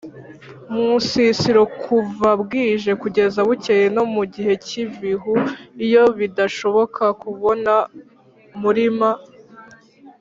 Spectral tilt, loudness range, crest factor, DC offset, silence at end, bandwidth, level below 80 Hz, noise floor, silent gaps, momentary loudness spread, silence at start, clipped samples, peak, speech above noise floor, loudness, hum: -5.5 dB/octave; 3 LU; 16 dB; under 0.1%; 0.1 s; 7.6 kHz; -58 dBFS; -46 dBFS; none; 9 LU; 0.05 s; under 0.1%; -2 dBFS; 28 dB; -18 LUFS; none